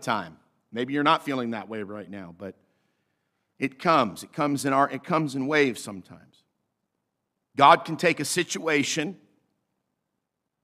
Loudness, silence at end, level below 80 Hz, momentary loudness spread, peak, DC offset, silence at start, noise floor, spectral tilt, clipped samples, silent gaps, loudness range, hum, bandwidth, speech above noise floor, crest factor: -24 LUFS; 1.5 s; -74 dBFS; 19 LU; -4 dBFS; under 0.1%; 0 s; -82 dBFS; -4 dB/octave; under 0.1%; none; 5 LU; none; 15.5 kHz; 57 dB; 24 dB